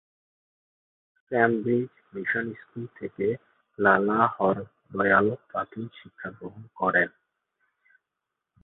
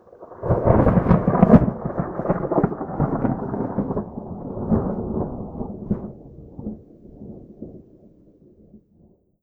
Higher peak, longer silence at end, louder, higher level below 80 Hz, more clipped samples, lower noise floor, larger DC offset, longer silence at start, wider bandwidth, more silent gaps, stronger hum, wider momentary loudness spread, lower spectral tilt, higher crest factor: second, -6 dBFS vs 0 dBFS; first, 1.55 s vs 0.65 s; second, -25 LUFS vs -21 LUFS; second, -64 dBFS vs -36 dBFS; neither; first, -85 dBFS vs -56 dBFS; neither; first, 1.3 s vs 0.2 s; first, 4.1 kHz vs 3.7 kHz; neither; neither; second, 18 LU vs 24 LU; second, -10.5 dB/octave vs -12 dB/octave; about the same, 22 dB vs 22 dB